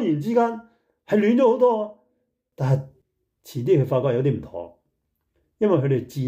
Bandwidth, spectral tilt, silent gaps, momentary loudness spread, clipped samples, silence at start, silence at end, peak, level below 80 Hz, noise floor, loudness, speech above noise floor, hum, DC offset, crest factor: 15.5 kHz; -8.5 dB/octave; none; 17 LU; under 0.1%; 0 s; 0 s; -8 dBFS; -62 dBFS; -74 dBFS; -21 LUFS; 54 dB; none; under 0.1%; 14 dB